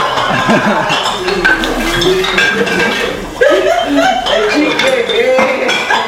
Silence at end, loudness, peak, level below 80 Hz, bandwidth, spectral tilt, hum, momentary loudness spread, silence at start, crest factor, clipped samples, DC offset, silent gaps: 0 s; -11 LUFS; 0 dBFS; -34 dBFS; 16.5 kHz; -3.5 dB/octave; none; 3 LU; 0 s; 12 dB; under 0.1%; under 0.1%; none